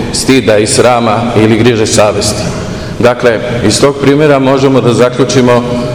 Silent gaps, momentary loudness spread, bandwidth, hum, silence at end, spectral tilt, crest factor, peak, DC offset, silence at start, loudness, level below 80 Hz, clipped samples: none; 5 LU; over 20 kHz; none; 0 s; -5 dB/octave; 8 dB; 0 dBFS; 0.6%; 0 s; -8 LUFS; -32 dBFS; 5%